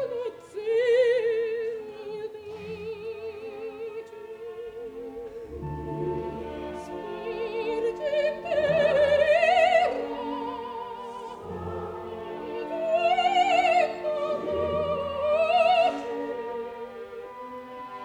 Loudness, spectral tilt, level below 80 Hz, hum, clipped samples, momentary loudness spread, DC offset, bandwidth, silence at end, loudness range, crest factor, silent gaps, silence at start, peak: -26 LUFS; -5 dB/octave; -56 dBFS; none; under 0.1%; 17 LU; under 0.1%; 11 kHz; 0 s; 13 LU; 16 dB; none; 0 s; -10 dBFS